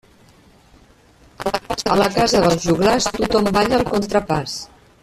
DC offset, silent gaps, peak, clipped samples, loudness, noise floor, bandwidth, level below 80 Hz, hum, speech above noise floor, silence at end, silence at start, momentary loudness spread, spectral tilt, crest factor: under 0.1%; none; -2 dBFS; under 0.1%; -18 LUFS; -50 dBFS; 14.5 kHz; -40 dBFS; none; 33 dB; 0.35 s; 1.4 s; 10 LU; -4.5 dB/octave; 16 dB